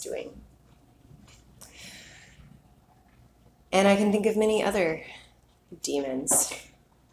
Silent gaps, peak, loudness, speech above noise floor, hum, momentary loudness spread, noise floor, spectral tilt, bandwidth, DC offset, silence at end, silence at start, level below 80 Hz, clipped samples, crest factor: none; -8 dBFS; -25 LUFS; 34 dB; none; 23 LU; -59 dBFS; -3.5 dB/octave; 16 kHz; under 0.1%; 0.5 s; 0 s; -58 dBFS; under 0.1%; 20 dB